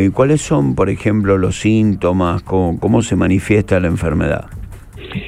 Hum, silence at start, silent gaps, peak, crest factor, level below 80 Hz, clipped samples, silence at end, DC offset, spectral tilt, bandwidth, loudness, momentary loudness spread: none; 0 s; none; 0 dBFS; 14 dB; -32 dBFS; under 0.1%; 0 s; under 0.1%; -7 dB/octave; 13 kHz; -15 LUFS; 10 LU